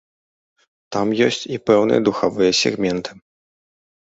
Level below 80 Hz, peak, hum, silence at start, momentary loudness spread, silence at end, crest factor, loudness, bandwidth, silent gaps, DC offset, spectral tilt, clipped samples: -56 dBFS; -2 dBFS; none; 0.9 s; 10 LU; 1.05 s; 18 dB; -18 LUFS; 8 kHz; none; under 0.1%; -4.5 dB/octave; under 0.1%